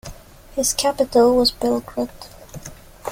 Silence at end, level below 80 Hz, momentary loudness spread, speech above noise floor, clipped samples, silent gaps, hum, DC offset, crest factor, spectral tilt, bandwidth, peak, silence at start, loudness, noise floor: 0 s; -44 dBFS; 23 LU; 21 dB; under 0.1%; none; none; under 0.1%; 16 dB; -3 dB/octave; 17 kHz; -4 dBFS; 0.05 s; -19 LUFS; -40 dBFS